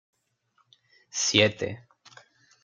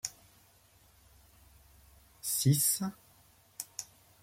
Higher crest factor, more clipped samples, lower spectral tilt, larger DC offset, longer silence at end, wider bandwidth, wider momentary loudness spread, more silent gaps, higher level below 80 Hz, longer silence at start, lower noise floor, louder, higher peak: about the same, 26 dB vs 22 dB; neither; second, -2.5 dB/octave vs -4 dB/octave; neither; first, 0.85 s vs 0.4 s; second, 10 kHz vs 16.5 kHz; second, 15 LU vs 21 LU; neither; about the same, -70 dBFS vs -68 dBFS; first, 1.15 s vs 0.05 s; first, -71 dBFS vs -64 dBFS; first, -24 LUFS vs -32 LUFS; first, -4 dBFS vs -14 dBFS